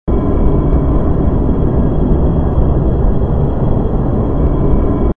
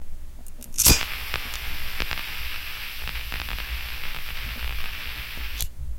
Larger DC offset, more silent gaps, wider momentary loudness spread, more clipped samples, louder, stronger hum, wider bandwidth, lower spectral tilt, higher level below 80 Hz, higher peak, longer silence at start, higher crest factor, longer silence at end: neither; neither; second, 2 LU vs 15 LU; neither; first, -14 LUFS vs -27 LUFS; neither; second, 3.5 kHz vs 17 kHz; first, -12.5 dB/octave vs -1.5 dB/octave; first, -14 dBFS vs -32 dBFS; first, 0 dBFS vs -4 dBFS; about the same, 0.05 s vs 0 s; second, 12 dB vs 24 dB; about the same, 0.05 s vs 0 s